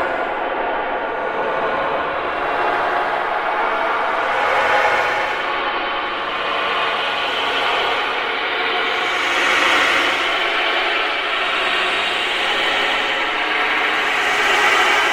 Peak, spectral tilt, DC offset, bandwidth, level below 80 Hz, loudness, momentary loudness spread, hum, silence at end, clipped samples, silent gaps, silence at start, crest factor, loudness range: -2 dBFS; -1.5 dB/octave; under 0.1%; 16.5 kHz; -50 dBFS; -17 LUFS; 7 LU; none; 0 s; under 0.1%; none; 0 s; 16 dB; 3 LU